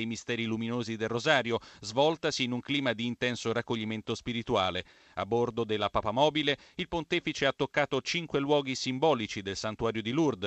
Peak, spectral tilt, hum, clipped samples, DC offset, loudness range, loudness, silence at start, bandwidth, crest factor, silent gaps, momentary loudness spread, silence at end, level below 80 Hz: -10 dBFS; -4.5 dB/octave; none; under 0.1%; under 0.1%; 2 LU; -30 LUFS; 0 s; 8.6 kHz; 22 dB; none; 7 LU; 0 s; -58 dBFS